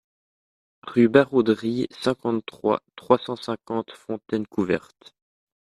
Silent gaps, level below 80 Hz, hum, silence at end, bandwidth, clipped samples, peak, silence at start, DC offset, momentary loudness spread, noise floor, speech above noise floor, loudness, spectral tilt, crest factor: none; -64 dBFS; none; 0.8 s; 12 kHz; under 0.1%; -2 dBFS; 0.85 s; under 0.1%; 12 LU; under -90 dBFS; over 67 dB; -24 LUFS; -7 dB/octave; 22 dB